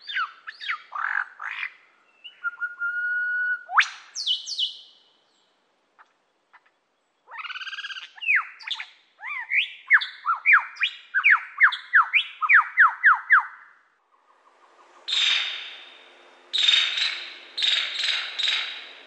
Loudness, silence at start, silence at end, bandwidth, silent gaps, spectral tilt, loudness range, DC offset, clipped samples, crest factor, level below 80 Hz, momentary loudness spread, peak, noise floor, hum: -22 LUFS; 0.05 s; 0.05 s; 10.5 kHz; none; 5.5 dB/octave; 11 LU; under 0.1%; under 0.1%; 20 dB; under -90 dBFS; 16 LU; -6 dBFS; -71 dBFS; none